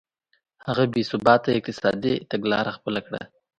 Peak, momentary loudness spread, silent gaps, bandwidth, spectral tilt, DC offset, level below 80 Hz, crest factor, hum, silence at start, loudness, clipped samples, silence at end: -2 dBFS; 12 LU; none; 9.2 kHz; -6.5 dB/octave; under 0.1%; -60 dBFS; 22 dB; none; 0.65 s; -23 LUFS; under 0.1%; 0.35 s